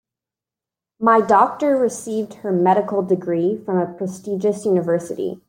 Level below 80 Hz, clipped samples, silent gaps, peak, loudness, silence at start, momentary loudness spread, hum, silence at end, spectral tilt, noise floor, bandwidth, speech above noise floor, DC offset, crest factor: -68 dBFS; under 0.1%; none; -2 dBFS; -19 LUFS; 1 s; 10 LU; none; 0.15 s; -7 dB/octave; -88 dBFS; 16 kHz; 70 dB; under 0.1%; 18 dB